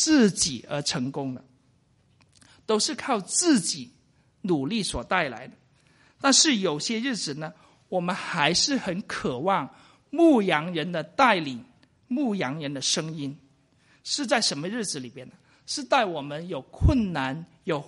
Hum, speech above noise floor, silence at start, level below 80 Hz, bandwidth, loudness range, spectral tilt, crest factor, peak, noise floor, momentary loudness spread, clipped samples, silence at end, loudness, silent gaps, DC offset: none; 38 dB; 0 s; -42 dBFS; 11.5 kHz; 4 LU; -3.5 dB/octave; 22 dB; -4 dBFS; -64 dBFS; 15 LU; under 0.1%; 0 s; -25 LUFS; none; under 0.1%